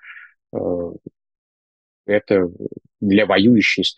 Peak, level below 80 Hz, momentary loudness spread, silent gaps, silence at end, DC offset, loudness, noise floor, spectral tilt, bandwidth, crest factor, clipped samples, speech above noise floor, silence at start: -2 dBFS; -58 dBFS; 19 LU; 1.38-2.04 s; 0.05 s; under 0.1%; -17 LUFS; under -90 dBFS; -6 dB/octave; 8.6 kHz; 18 dB; under 0.1%; over 73 dB; 0.05 s